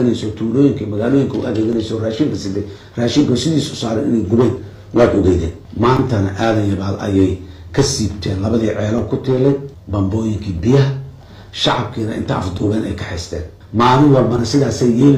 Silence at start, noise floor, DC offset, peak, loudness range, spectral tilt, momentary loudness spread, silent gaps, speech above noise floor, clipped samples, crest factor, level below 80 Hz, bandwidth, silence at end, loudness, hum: 0 s; -36 dBFS; under 0.1%; 0 dBFS; 3 LU; -6.5 dB/octave; 10 LU; none; 21 dB; under 0.1%; 16 dB; -40 dBFS; 12 kHz; 0 s; -16 LUFS; none